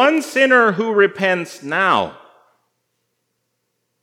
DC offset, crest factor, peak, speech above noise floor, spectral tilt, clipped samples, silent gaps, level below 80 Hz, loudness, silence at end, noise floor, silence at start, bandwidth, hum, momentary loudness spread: under 0.1%; 18 dB; 0 dBFS; 56 dB; -4.5 dB/octave; under 0.1%; none; -70 dBFS; -16 LUFS; 1.9 s; -72 dBFS; 0 s; 16 kHz; none; 10 LU